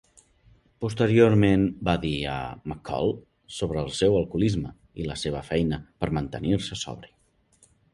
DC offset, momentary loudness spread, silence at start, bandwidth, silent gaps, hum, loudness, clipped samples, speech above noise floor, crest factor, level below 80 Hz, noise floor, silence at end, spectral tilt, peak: under 0.1%; 16 LU; 0.8 s; 11.5 kHz; none; none; -26 LUFS; under 0.1%; 38 dB; 20 dB; -44 dBFS; -63 dBFS; 0.85 s; -6.5 dB/octave; -6 dBFS